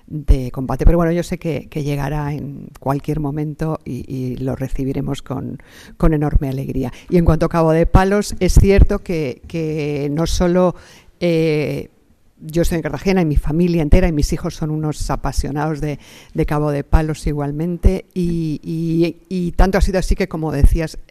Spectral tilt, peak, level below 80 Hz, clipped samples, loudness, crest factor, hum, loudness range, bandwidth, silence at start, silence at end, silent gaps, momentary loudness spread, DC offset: -7 dB/octave; -2 dBFS; -22 dBFS; under 0.1%; -19 LUFS; 16 dB; none; 7 LU; 14.5 kHz; 0.1 s; 0.05 s; none; 10 LU; under 0.1%